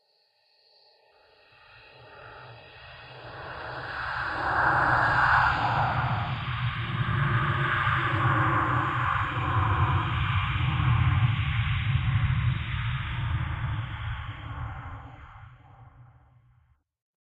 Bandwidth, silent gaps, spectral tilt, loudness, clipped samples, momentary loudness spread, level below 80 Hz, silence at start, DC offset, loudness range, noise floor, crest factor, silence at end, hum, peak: 8 kHz; none; -7.5 dB/octave; -26 LUFS; under 0.1%; 21 LU; -40 dBFS; 1.75 s; under 0.1%; 14 LU; -68 dBFS; 20 dB; 1.25 s; none; -8 dBFS